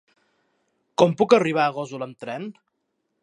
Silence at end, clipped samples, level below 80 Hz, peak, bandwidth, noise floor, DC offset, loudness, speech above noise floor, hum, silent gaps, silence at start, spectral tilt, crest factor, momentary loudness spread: 0.7 s; under 0.1%; -70 dBFS; -2 dBFS; 10.5 kHz; -76 dBFS; under 0.1%; -22 LUFS; 54 dB; none; none; 1 s; -6 dB/octave; 22 dB; 16 LU